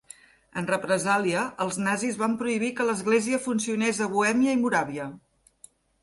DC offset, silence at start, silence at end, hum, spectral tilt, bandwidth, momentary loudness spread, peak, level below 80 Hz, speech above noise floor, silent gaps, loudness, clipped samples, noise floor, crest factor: under 0.1%; 0.55 s; 0.85 s; none; -4.5 dB/octave; 11.5 kHz; 7 LU; -10 dBFS; -66 dBFS; 31 dB; none; -26 LUFS; under 0.1%; -56 dBFS; 18 dB